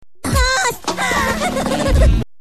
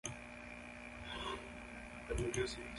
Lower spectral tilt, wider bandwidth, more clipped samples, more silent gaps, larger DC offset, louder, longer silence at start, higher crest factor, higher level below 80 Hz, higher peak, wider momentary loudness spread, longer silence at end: about the same, -4 dB/octave vs -4 dB/octave; first, 14 kHz vs 11.5 kHz; neither; neither; first, 2% vs under 0.1%; first, -17 LUFS vs -45 LUFS; first, 0.25 s vs 0.05 s; about the same, 14 dB vs 18 dB; first, -20 dBFS vs -54 dBFS; first, -2 dBFS vs -26 dBFS; second, 4 LU vs 11 LU; first, 0.15 s vs 0 s